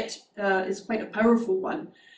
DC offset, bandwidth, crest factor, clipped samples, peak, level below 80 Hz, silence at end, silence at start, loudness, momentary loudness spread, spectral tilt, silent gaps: under 0.1%; 9.2 kHz; 16 dB; under 0.1%; -10 dBFS; -64 dBFS; 0.25 s; 0 s; -27 LUFS; 11 LU; -5 dB/octave; none